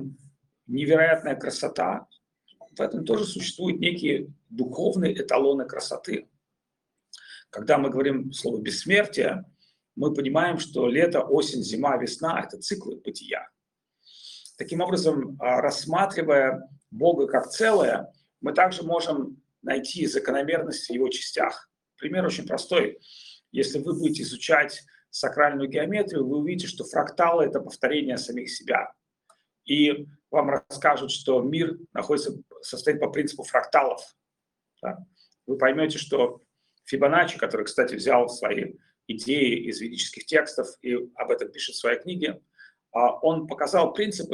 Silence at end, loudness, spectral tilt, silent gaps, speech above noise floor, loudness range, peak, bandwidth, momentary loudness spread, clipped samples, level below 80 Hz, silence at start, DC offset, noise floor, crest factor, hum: 0 s; -25 LUFS; -4.5 dB/octave; none; 60 dB; 4 LU; -4 dBFS; 12.5 kHz; 13 LU; under 0.1%; -70 dBFS; 0 s; under 0.1%; -85 dBFS; 22 dB; none